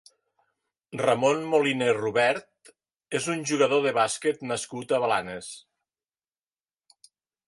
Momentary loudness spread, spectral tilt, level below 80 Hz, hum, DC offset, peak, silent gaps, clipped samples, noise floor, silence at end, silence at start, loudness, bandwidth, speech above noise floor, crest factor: 12 LU; -4 dB/octave; -70 dBFS; none; under 0.1%; -8 dBFS; none; under 0.1%; under -90 dBFS; 1.9 s; 0.9 s; -25 LUFS; 11.5 kHz; over 65 dB; 20 dB